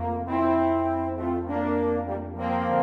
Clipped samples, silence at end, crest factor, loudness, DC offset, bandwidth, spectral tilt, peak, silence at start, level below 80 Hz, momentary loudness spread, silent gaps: under 0.1%; 0 s; 14 dB; -26 LUFS; under 0.1%; 5.2 kHz; -9.5 dB/octave; -12 dBFS; 0 s; -46 dBFS; 6 LU; none